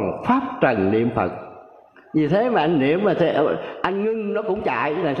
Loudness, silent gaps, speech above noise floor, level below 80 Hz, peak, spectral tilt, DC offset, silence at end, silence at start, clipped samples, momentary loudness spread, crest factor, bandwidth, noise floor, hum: -21 LUFS; none; 28 dB; -54 dBFS; -4 dBFS; -8.5 dB/octave; under 0.1%; 0 s; 0 s; under 0.1%; 6 LU; 16 dB; 6.6 kHz; -48 dBFS; none